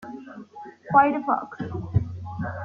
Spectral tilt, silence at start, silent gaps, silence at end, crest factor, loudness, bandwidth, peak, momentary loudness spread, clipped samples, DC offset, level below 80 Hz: -9.5 dB/octave; 0 s; none; 0 s; 22 dB; -24 LUFS; 6.6 kHz; -4 dBFS; 23 LU; under 0.1%; under 0.1%; -48 dBFS